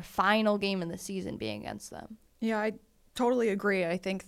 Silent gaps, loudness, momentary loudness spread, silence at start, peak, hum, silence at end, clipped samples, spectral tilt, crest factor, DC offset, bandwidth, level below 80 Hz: none; -30 LUFS; 18 LU; 0 s; -12 dBFS; none; 0 s; under 0.1%; -5 dB/octave; 18 dB; under 0.1%; 15.5 kHz; -62 dBFS